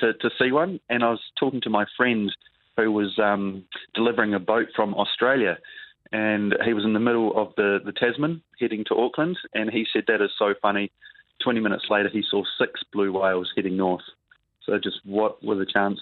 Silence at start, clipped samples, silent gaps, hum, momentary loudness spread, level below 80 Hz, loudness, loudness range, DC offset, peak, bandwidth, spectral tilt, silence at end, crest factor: 0 s; under 0.1%; none; none; 7 LU; -66 dBFS; -24 LUFS; 2 LU; under 0.1%; -4 dBFS; 4.4 kHz; -9 dB/octave; 0 s; 20 dB